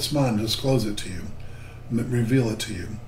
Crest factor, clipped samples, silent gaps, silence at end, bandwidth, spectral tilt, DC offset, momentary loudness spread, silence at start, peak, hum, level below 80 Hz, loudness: 16 dB; under 0.1%; none; 0 s; 16 kHz; -5.5 dB/octave; under 0.1%; 18 LU; 0 s; -8 dBFS; none; -42 dBFS; -25 LUFS